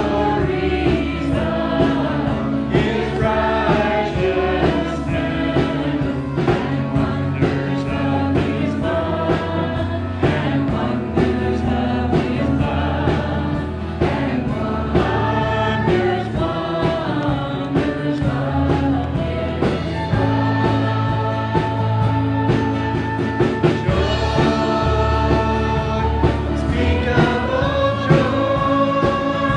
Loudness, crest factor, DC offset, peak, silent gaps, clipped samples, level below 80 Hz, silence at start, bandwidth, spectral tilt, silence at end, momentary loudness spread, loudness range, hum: -19 LUFS; 18 dB; under 0.1%; 0 dBFS; none; under 0.1%; -30 dBFS; 0 s; 9.8 kHz; -7.5 dB/octave; 0 s; 4 LU; 2 LU; none